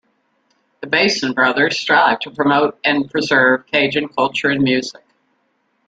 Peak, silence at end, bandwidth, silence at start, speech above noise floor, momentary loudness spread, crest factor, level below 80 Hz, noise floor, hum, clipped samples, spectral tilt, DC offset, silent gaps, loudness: -2 dBFS; 0.95 s; 9 kHz; 0.8 s; 49 dB; 5 LU; 16 dB; -60 dBFS; -65 dBFS; none; under 0.1%; -4 dB/octave; under 0.1%; none; -16 LUFS